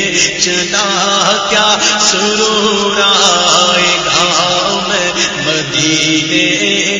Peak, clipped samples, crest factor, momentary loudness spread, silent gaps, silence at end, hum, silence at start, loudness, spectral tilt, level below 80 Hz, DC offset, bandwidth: 0 dBFS; 0.1%; 12 dB; 5 LU; none; 0 s; none; 0 s; -10 LUFS; -1.5 dB/octave; -46 dBFS; under 0.1%; 11 kHz